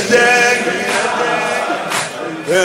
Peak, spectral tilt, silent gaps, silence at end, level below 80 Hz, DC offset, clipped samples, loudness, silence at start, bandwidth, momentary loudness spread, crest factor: 0 dBFS; -2.5 dB/octave; none; 0 s; -58 dBFS; under 0.1%; under 0.1%; -14 LUFS; 0 s; 16 kHz; 9 LU; 14 dB